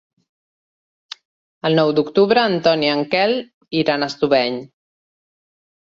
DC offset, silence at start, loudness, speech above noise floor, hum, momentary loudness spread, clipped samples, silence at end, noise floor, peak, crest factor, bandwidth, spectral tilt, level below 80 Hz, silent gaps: under 0.1%; 1.65 s; -18 LUFS; over 73 dB; none; 18 LU; under 0.1%; 1.3 s; under -90 dBFS; -2 dBFS; 18 dB; 7.6 kHz; -6 dB/octave; -62 dBFS; 3.54-3.61 s